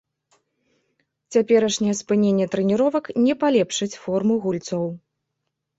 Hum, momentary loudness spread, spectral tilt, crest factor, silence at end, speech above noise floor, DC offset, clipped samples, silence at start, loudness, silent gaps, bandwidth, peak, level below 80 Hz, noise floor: none; 8 LU; -5.5 dB/octave; 16 dB; 0.8 s; 59 dB; under 0.1%; under 0.1%; 1.3 s; -21 LUFS; none; 8.2 kHz; -6 dBFS; -64 dBFS; -79 dBFS